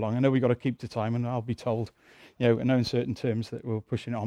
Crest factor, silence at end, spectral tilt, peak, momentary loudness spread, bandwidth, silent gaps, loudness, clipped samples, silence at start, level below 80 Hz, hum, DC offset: 18 dB; 0 s; -8 dB/octave; -10 dBFS; 9 LU; 10 kHz; none; -28 LUFS; under 0.1%; 0 s; -60 dBFS; none; under 0.1%